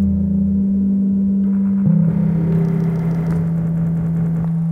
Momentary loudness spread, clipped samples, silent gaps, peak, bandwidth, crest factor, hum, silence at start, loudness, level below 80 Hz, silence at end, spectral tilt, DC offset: 4 LU; under 0.1%; none; -6 dBFS; 2.5 kHz; 10 dB; none; 0 s; -17 LUFS; -40 dBFS; 0 s; -11.5 dB/octave; under 0.1%